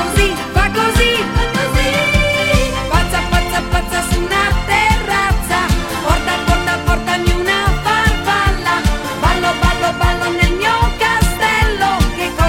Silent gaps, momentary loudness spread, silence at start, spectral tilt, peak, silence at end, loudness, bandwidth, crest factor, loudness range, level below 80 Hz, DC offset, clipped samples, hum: none; 4 LU; 0 s; -4.5 dB/octave; 0 dBFS; 0 s; -15 LUFS; 17 kHz; 14 dB; 1 LU; -20 dBFS; under 0.1%; under 0.1%; none